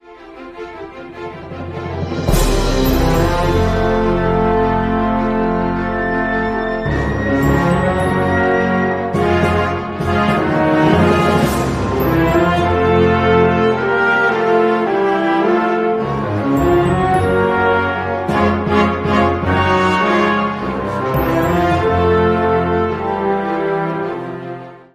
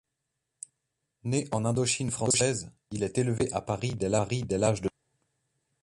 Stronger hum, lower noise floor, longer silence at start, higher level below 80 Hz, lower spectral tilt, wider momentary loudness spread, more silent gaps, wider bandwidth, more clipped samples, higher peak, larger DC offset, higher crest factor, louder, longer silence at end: neither; second, -35 dBFS vs -83 dBFS; second, 0.05 s vs 1.25 s; first, -28 dBFS vs -56 dBFS; first, -6.5 dB/octave vs -4.5 dB/octave; second, 8 LU vs 15 LU; neither; first, 15.5 kHz vs 11.5 kHz; neither; first, 0 dBFS vs -12 dBFS; neither; about the same, 14 dB vs 18 dB; first, -15 LUFS vs -29 LUFS; second, 0.15 s vs 0.95 s